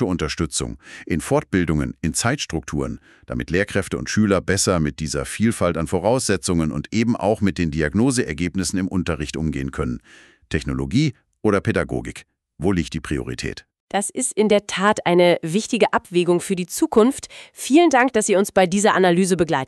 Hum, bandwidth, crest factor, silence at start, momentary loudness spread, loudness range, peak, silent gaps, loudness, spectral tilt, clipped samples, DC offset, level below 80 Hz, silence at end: none; 13.5 kHz; 18 dB; 0 s; 11 LU; 6 LU; -2 dBFS; 13.80-13.88 s; -20 LUFS; -5 dB/octave; under 0.1%; under 0.1%; -40 dBFS; 0 s